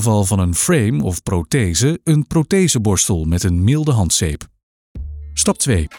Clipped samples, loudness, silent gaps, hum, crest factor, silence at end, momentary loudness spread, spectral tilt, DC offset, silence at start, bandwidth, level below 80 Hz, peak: under 0.1%; -16 LUFS; 4.63-4.95 s; none; 14 dB; 0 s; 8 LU; -5 dB/octave; under 0.1%; 0 s; 18 kHz; -32 dBFS; -4 dBFS